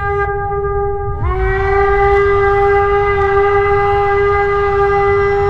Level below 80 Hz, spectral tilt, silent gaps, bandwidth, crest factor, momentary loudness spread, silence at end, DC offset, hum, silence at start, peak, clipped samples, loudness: -24 dBFS; -8 dB/octave; none; 6.2 kHz; 12 dB; 6 LU; 0 s; under 0.1%; none; 0 s; -2 dBFS; under 0.1%; -13 LUFS